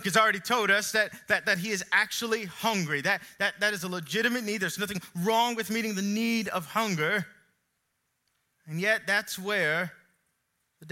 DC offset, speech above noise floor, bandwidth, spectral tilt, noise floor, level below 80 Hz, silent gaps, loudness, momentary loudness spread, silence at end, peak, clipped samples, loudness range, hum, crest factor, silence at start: under 0.1%; 50 dB; 16.5 kHz; -3.5 dB/octave; -78 dBFS; -74 dBFS; none; -27 LUFS; 7 LU; 0 s; -8 dBFS; under 0.1%; 4 LU; none; 22 dB; 0 s